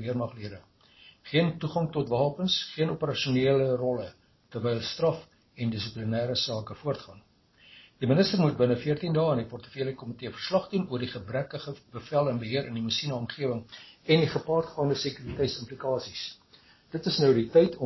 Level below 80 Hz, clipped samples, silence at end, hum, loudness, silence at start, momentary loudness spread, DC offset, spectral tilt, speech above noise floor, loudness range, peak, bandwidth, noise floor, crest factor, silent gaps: -58 dBFS; under 0.1%; 0 s; none; -28 LUFS; 0 s; 13 LU; under 0.1%; -6.5 dB/octave; 31 dB; 4 LU; -8 dBFS; 6.2 kHz; -59 dBFS; 20 dB; none